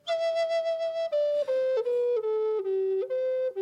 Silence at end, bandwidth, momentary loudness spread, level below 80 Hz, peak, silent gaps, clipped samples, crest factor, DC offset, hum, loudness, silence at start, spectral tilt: 0 s; 9.8 kHz; 2 LU; -86 dBFS; -20 dBFS; none; under 0.1%; 8 dB; under 0.1%; none; -28 LUFS; 0.05 s; -3 dB/octave